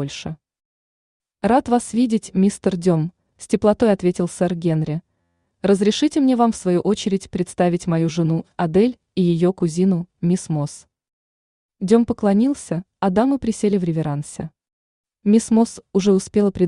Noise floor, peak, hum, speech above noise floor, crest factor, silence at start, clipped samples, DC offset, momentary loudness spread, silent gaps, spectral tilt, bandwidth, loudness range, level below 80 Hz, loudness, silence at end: -70 dBFS; -4 dBFS; none; 51 dB; 16 dB; 0 s; under 0.1%; under 0.1%; 9 LU; 0.65-1.20 s, 11.13-11.69 s, 14.73-15.04 s; -6.5 dB/octave; 11 kHz; 2 LU; -52 dBFS; -19 LUFS; 0 s